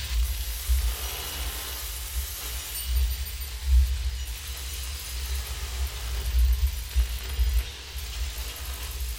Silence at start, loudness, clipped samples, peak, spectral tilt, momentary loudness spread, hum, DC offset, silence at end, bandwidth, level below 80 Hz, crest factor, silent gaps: 0 s; -30 LUFS; under 0.1%; -12 dBFS; -2.5 dB/octave; 8 LU; none; under 0.1%; 0 s; 17 kHz; -28 dBFS; 16 dB; none